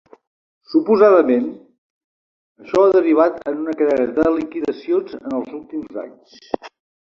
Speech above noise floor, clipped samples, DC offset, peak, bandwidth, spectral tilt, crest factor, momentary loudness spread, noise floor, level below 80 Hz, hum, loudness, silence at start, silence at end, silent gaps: over 73 dB; under 0.1%; under 0.1%; -2 dBFS; 7.2 kHz; -7 dB/octave; 16 dB; 16 LU; under -90 dBFS; -56 dBFS; none; -17 LUFS; 0.7 s; 0.35 s; 1.78-2.55 s